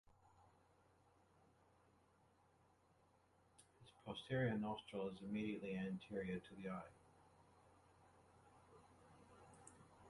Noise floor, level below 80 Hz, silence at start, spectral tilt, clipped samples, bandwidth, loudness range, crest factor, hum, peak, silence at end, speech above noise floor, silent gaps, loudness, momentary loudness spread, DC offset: -76 dBFS; -76 dBFS; 0.4 s; -7 dB/octave; under 0.1%; 11 kHz; 15 LU; 20 dB; none; -30 dBFS; 0 s; 29 dB; none; -47 LUFS; 25 LU; under 0.1%